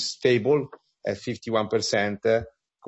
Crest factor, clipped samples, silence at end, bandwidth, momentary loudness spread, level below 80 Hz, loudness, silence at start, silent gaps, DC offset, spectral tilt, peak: 16 dB; under 0.1%; 0.4 s; 8.2 kHz; 12 LU; -60 dBFS; -25 LUFS; 0 s; none; under 0.1%; -4.5 dB/octave; -8 dBFS